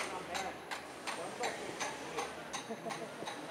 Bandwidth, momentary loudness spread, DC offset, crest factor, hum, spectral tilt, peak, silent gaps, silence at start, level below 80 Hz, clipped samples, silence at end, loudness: 16 kHz; 4 LU; under 0.1%; 18 dB; none; -2.5 dB/octave; -24 dBFS; none; 0 s; -74 dBFS; under 0.1%; 0 s; -41 LUFS